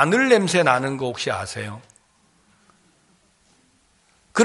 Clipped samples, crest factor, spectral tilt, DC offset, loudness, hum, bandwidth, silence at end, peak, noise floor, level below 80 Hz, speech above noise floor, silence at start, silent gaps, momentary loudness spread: under 0.1%; 22 dB; -4.5 dB/octave; under 0.1%; -20 LUFS; none; 11.5 kHz; 0 s; -2 dBFS; -61 dBFS; -64 dBFS; 41 dB; 0 s; none; 16 LU